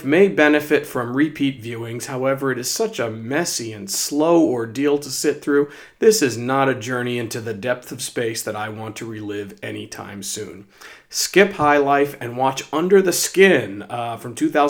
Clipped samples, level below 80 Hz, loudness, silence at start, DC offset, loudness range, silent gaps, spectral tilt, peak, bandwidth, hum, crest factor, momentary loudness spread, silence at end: under 0.1%; -62 dBFS; -20 LUFS; 0 s; under 0.1%; 10 LU; none; -4 dB/octave; 0 dBFS; over 20 kHz; none; 20 dB; 14 LU; 0 s